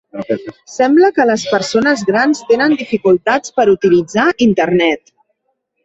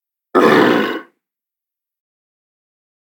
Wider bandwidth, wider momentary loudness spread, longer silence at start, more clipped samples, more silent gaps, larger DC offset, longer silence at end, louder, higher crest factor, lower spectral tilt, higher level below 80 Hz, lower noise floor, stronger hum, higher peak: second, 8 kHz vs 17.5 kHz; about the same, 11 LU vs 12 LU; second, 0.15 s vs 0.35 s; neither; neither; neither; second, 0.9 s vs 2 s; about the same, -13 LUFS vs -13 LUFS; second, 12 dB vs 18 dB; about the same, -5 dB/octave vs -5.5 dB/octave; first, -54 dBFS vs -66 dBFS; second, -68 dBFS vs -86 dBFS; neither; about the same, 0 dBFS vs 0 dBFS